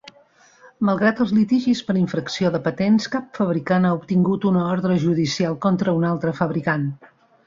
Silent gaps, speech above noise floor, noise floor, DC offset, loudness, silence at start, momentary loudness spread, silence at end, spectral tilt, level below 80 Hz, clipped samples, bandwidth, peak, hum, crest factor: none; 34 dB; -54 dBFS; under 0.1%; -20 LUFS; 0.8 s; 5 LU; 0.5 s; -7 dB/octave; -58 dBFS; under 0.1%; 7.6 kHz; -4 dBFS; none; 16 dB